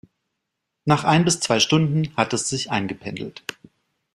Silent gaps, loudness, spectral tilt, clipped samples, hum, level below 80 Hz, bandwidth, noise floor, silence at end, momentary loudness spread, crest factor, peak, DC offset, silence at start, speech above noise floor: none; -21 LUFS; -4 dB/octave; under 0.1%; none; -56 dBFS; 13 kHz; -80 dBFS; 0.65 s; 14 LU; 22 dB; -2 dBFS; under 0.1%; 0.85 s; 59 dB